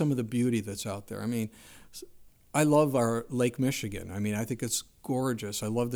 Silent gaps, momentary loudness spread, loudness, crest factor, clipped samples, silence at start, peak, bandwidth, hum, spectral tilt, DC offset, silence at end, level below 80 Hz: none; 12 LU; -30 LUFS; 18 dB; under 0.1%; 0 s; -12 dBFS; over 20 kHz; none; -5.5 dB/octave; under 0.1%; 0 s; -58 dBFS